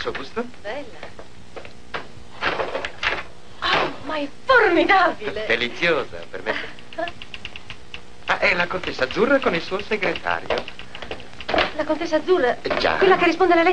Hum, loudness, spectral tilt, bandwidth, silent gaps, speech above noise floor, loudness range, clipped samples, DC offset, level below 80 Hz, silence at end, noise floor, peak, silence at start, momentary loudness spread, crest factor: none; -21 LUFS; -4.5 dB/octave; 9.8 kHz; none; 21 dB; 6 LU; under 0.1%; 2%; -48 dBFS; 0 s; -42 dBFS; -4 dBFS; 0 s; 20 LU; 18 dB